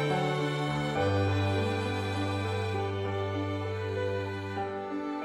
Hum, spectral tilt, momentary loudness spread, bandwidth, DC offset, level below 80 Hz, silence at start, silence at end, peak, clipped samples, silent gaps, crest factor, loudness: none; -6.5 dB/octave; 7 LU; 11.5 kHz; under 0.1%; -60 dBFS; 0 s; 0 s; -16 dBFS; under 0.1%; none; 14 dB; -31 LUFS